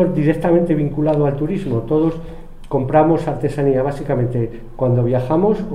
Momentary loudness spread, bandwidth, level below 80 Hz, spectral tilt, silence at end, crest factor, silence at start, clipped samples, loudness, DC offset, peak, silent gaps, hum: 7 LU; 11 kHz; -34 dBFS; -9.5 dB/octave; 0 s; 16 dB; 0 s; under 0.1%; -18 LUFS; under 0.1%; 0 dBFS; none; none